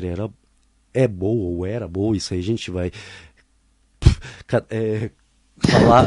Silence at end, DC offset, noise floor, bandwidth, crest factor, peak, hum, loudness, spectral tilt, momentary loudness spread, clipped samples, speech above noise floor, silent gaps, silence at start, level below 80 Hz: 0 s; under 0.1%; -60 dBFS; 11.5 kHz; 20 dB; 0 dBFS; none; -22 LUFS; -6.5 dB/octave; 11 LU; under 0.1%; 41 dB; none; 0 s; -32 dBFS